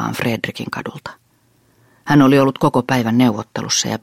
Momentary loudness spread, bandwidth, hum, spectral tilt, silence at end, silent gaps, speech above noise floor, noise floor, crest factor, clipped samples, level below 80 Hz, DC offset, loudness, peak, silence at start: 18 LU; 16 kHz; none; -5 dB/octave; 0.05 s; none; 41 dB; -58 dBFS; 16 dB; under 0.1%; -52 dBFS; under 0.1%; -16 LUFS; -2 dBFS; 0 s